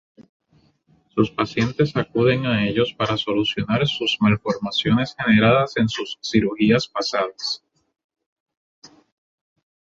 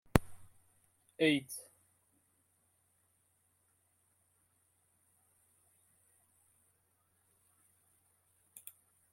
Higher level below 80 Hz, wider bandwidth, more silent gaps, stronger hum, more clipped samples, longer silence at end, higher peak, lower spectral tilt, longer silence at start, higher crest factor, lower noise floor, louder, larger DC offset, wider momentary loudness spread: first, -50 dBFS vs -58 dBFS; second, 7.8 kHz vs 16.5 kHz; first, 8.04-8.09 s, 8.26-8.46 s, 8.57-8.82 s vs none; neither; neither; second, 0.95 s vs 7.5 s; about the same, -2 dBFS vs -4 dBFS; about the same, -6 dB/octave vs -5 dB/octave; first, 1.15 s vs 0.15 s; second, 20 dB vs 38 dB; second, -60 dBFS vs -76 dBFS; first, -20 LUFS vs -34 LUFS; neither; second, 6 LU vs 25 LU